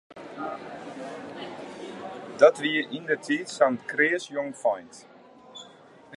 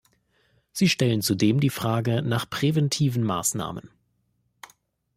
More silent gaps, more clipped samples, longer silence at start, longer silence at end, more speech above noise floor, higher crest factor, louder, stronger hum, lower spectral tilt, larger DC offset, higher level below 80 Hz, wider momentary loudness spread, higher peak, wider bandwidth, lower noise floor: neither; neither; second, 0.1 s vs 0.75 s; second, 0.05 s vs 1.3 s; second, 26 dB vs 48 dB; first, 24 dB vs 16 dB; about the same, -25 LUFS vs -24 LUFS; neither; about the same, -4 dB/octave vs -5 dB/octave; neither; second, -78 dBFS vs -60 dBFS; first, 22 LU vs 9 LU; first, -4 dBFS vs -8 dBFS; second, 11.5 kHz vs 16 kHz; second, -51 dBFS vs -71 dBFS